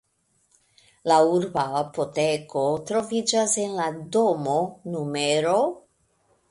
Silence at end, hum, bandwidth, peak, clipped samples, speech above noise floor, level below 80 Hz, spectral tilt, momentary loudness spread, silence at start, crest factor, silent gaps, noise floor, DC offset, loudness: 0.7 s; none; 11.5 kHz; -6 dBFS; under 0.1%; 45 dB; -66 dBFS; -4 dB/octave; 8 LU; 1.05 s; 20 dB; none; -68 dBFS; under 0.1%; -24 LUFS